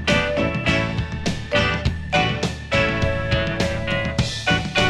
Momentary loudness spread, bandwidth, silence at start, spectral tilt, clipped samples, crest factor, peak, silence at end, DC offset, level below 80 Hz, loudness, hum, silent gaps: 5 LU; 12.5 kHz; 0 s; -5 dB/octave; under 0.1%; 18 dB; -4 dBFS; 0 s; under 0.1%; -32 dBFS; -21 LUFS; none; none